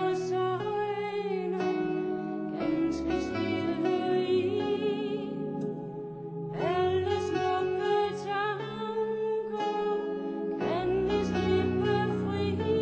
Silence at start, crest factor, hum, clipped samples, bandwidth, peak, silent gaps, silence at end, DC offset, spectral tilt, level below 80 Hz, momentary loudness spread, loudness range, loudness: 0 s; 14 dB; none; under 0.1%; 8 kHz; -16 dBFS; none; 0 s; under 0.1%; -7 dB/octave; -52 dBFS; 6 LU; 2 LU; -30 LUFS